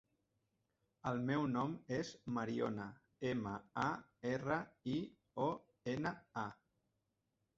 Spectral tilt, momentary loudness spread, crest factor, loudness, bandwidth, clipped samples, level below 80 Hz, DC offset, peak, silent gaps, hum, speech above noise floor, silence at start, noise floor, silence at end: -5.5 dB/octave; 8 LU; 20 dB; -42 LUFS; 7.6 kHz; under 0.1%; -72 dBFS; under 0.1%; -22 dBFS; none; none; 45 dB; 1.05 s; -86 dBFS; 1.05 s